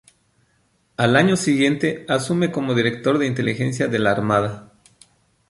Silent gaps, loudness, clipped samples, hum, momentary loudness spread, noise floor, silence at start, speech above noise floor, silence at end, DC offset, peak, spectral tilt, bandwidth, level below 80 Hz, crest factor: none; -20 LUFS; under 0.1%; none; 7 LU; -64 dBFS; 1 s; 44 dB; 0.85 s; under 0.1%; -2 dBFS; -5.5 dB/octave; 11.5 kHz; -56 dBFS; 20 dB